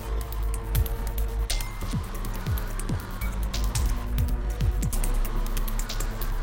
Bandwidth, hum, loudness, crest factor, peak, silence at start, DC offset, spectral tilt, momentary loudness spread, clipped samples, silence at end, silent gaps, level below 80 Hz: 17 kHz; none; -30 LUFS; 14 dB; -12 dBFS; 0 s; 0.3%; -4.5 dB/octave; 4 LU; under 0.1%; 0 s; none; -28 dBFS